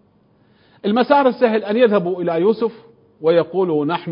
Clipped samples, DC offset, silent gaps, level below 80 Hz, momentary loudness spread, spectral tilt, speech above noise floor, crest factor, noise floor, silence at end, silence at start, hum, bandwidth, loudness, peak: under 0.1%; under 0.1%; none; -68 dBFS; 8 LU; -11.5 dB/octave; 39 dB; 18 dB; -56 dBFS; 0 s; 0.85 s; none; 5.4 kHz; -17 LUFS; 0 dBFS